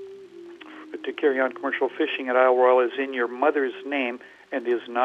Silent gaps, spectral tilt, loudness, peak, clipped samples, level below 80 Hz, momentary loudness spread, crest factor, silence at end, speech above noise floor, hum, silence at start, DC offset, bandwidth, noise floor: none; -5 dB/octave; -24 LUFS; -6 dBFS; under 0.1%; -82 dBFS; 23 LU; 18 dB; 0 s; 20 dB; none; 0 s; under 0.1%; 6 kHz; -43 dBFS